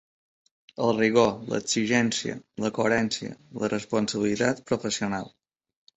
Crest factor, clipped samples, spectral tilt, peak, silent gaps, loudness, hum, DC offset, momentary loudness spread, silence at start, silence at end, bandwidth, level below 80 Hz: 20 dB; under 0.1%; -4 dB/octave; -6 dBFS; none; -26 LUFS; none; under 0.1%; 11 LU; 0.8 s; 0.7 s; 8.4 kHz; -60 dBFS